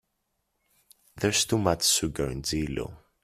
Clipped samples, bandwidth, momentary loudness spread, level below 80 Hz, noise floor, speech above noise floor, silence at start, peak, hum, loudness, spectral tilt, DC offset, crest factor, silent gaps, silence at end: under 0.1%; 16 kHz; 11 LU; -48 dBFS; -78 dBFS; 51 dB; 1.15 s; -8 dBFS; none; -26 LUFS; -3 dB/octave; under 0.1%; 22 dB; none; 0.25 s